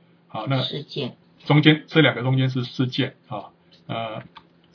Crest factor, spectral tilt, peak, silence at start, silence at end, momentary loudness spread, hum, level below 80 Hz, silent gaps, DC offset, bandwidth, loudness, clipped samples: 24 dB; -7.5 dB/octave; 0 dBFS; 0.35 s; 0.5 s; 19 LU; none; -70 dBFS; none; under 0.1%; 5.4 kHz; -22 LUFS; under 0.1%